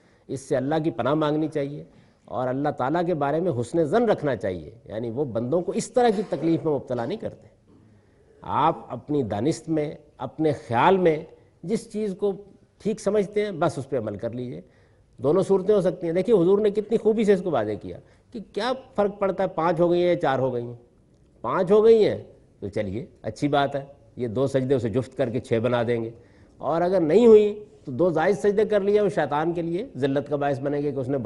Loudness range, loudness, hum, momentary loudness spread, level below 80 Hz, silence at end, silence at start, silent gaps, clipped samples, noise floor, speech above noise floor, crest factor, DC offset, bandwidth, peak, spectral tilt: 6 LU; -24 LUFS; none; 15 LU; -58 dBFS; 0 s; 0.3 s; none; under 0.1%; -57 dBFS; 34 dB; 20 dB; under 0.1%; 11.5 kHz; -4 dBFS; -7 dB/octave